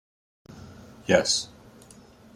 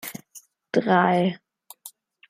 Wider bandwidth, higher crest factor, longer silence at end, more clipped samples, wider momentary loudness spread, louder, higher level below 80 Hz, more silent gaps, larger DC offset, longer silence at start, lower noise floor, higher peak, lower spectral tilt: second, 13.5 kHz vs 16 kHz; first, 26 dB vs 20 dB; first, 0.9 s vs 0.4 s; neither; about the same, 26 LU vs 24 LU; about the same, -23 LUFS vs -22 LUFS; first, -60 dBFS vs -70 dBFS; neither; neither; first, 0.5 s vs 0.05 s; about the same, -51 dBFS vs -51 dBFS; about the same, -4 dBFS vs -6 dBFS; second, -2.5 dB/octave vs -6 dB/octave